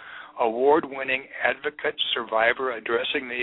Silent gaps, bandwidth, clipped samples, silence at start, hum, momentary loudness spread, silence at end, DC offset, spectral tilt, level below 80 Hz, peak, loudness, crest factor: none; 4.1 kHz; under 0.1%; 0 s; none; 6 LU; 0 s; under 0.1%; -6.5 dB/octave; -64 dBFS; -6 dBFS; -24 LUFS; 20 dB